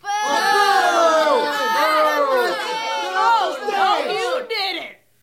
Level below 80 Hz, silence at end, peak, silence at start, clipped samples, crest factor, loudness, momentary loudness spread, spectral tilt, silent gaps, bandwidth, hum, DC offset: -68 dBFS; 0.3 s; -4 dBFS; 0.05 s; under 0.1%; 14 dB; -18 LUFS; 8 LU; -1 dB/octave; none; 16.5 kHz; none; under 0.1%